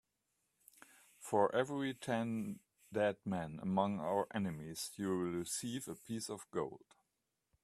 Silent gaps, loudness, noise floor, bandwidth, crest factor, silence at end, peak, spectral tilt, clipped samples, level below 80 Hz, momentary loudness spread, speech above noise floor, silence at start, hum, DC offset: none; -39 LUFS; -87 dBFS; 14.5 kHz; 22 dB; 0.85 s; -18 dBFS; -5 dB/octave; under 0.1%; -76 dBFS; 10 LU; 48 dB; 1.2 s; none; under 0.1%